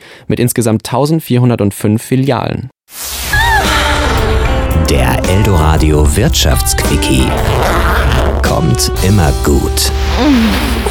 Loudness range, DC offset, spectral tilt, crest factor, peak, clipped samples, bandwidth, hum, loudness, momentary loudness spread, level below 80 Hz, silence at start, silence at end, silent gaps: 2 LU; under 0.1%; -5 dB/octave; 10 dB; 0 dBFS; under 0.1%; 19.5 kHz; none; -11 LUFS; 4 LU; -16 dBFS; 0.05 s; 0 s; none